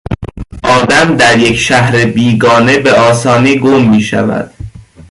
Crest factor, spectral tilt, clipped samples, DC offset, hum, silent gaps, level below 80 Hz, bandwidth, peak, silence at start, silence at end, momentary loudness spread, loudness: 8 dB; -5 dB/octave; under 0.1%; under 0.1%; none; none; -34 dBFS; 11.5 kHz; 0 dBFS; 0.1 s; 0.3 s; 12 LU; -8 LUFS